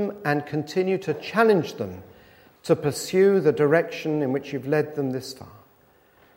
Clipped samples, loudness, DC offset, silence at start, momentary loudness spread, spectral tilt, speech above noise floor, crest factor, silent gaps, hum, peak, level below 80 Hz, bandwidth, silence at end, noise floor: under 0.1%; -23 LUFS; under 0.1%; 0 s; 14 LU; -6 dB/octave; 35 dB; 20 dB; none; none; -4 dBFS; -66 dBFS; 16 kHz; 0.8 s; -58 dBFS